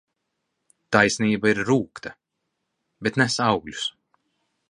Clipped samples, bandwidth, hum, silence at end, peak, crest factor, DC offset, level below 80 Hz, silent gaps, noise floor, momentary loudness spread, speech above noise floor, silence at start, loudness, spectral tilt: under 0.1%; 11 kHz; none; 0.8 s; -2 dBFS; 24 dB; under 0.1%; -58 dBFS; none; -79 dBFS; 13 LU; 57 dB; 0.9 s; -22 LUFS; -4.5 dB/octave